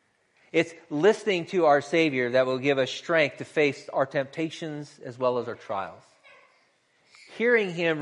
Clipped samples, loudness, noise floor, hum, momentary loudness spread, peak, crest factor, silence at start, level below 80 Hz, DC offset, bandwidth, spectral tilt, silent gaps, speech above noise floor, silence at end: under 0.1%; -25 LUFS; -66 dBFS; none; 11 LU; -8 dBFS; 18 dB; 0.55 s; -76 dBFS; under 0.1%; 11 kHz; -5 dB/octave; none; 41 dB; 0 s